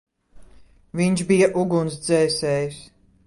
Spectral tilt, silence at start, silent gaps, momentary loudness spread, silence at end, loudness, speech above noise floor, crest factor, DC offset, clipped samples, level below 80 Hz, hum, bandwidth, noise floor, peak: -5.5 dB/octave; 0.35 s; none; 12 LU; 0.4 s; -21 LUFS; 30 dB; 16 dB; under 0.1%; under 0.1%; -54 dBFS; none; 11.5 kHz; -50 dBFS; -6 dBFS